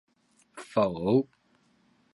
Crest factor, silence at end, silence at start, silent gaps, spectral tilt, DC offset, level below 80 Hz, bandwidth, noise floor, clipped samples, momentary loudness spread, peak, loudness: 20 dB; 0.9 s; 0.55 s; none; -7.5 dB/octave; under 0.1%; -64 dBFS; 11.5 kHz; -67 dBFS; under 0.1%; 22 LU; -12 dBFS; -27 LUFS